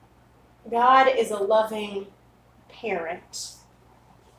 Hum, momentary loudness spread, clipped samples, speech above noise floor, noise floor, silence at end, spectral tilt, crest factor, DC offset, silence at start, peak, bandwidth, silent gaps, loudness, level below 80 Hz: 60 Hz at -60 dBFS; 18 LU; under 0.1%; 33 dB; -56 dBFS; 0.85 s; -3 dB/octave; 20 dB; under 0.1%; 0.65 s; -4 dBFS; 16 kHz; none; -23 LUFS; -62 dBFS